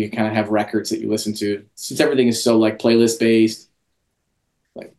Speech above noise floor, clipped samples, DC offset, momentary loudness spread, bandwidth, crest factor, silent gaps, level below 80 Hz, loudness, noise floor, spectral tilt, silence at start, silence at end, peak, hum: 54 dB; under 0.1%; under 0.1%; 9 LU; 12.5 kHz; 18 dB; none; -64 dBFS; -18 LUFS; -71 dBFS; -4.5 dB/octave; 0 s; 0.1 s; -2 dBFS; none